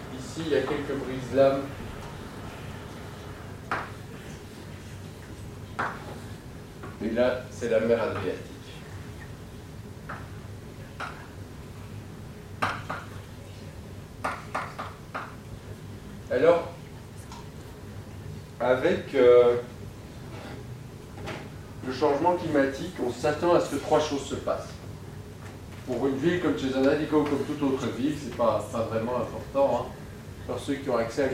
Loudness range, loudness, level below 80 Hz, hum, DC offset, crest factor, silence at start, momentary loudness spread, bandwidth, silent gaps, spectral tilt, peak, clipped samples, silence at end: 13 LU; -27 LUFS; -50 dBFS; none; under 0.1%; 22 dB; 0 s; 19 LU; 16 kHz; none; -6 dB/octave; -8 dBFS; under 0.1%; 0 s